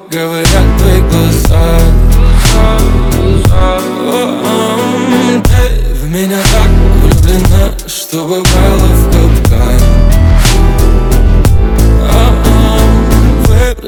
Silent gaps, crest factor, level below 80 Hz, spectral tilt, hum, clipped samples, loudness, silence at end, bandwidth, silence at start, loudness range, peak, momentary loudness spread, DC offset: none; 6 dB; -8 dBFS; -5.5 dB/octave; none; 4%; -9 LUFS; 0 s; 18 kHz; 0.1 s; 2 LU; 0 dBFS; 4 LU; under 0.1%